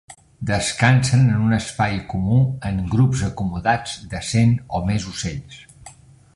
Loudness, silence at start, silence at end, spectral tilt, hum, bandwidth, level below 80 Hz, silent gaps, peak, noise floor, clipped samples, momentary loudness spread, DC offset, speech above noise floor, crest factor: -20 LUFS; 0.1 s; 0.45 s; -5.5 dB/octave; none; 11.5 kHz; -40 dBFS; none; -2 dBFS; -45 dBFS; under 0.1%; 12 LU; under 0.1%; 26 dB; 18 dB